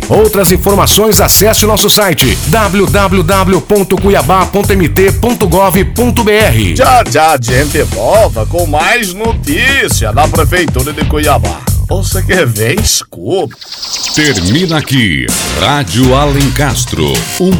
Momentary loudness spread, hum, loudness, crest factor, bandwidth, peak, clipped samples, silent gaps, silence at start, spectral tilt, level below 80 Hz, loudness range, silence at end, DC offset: 7 LU; none; -9 LUFS; 8 dB; over 20 kHz; 0 dBFS; under 0.1%; none; 0 s; -4 dB/octave; -20 dBFS; 4 LU; 0 s; under 0.1%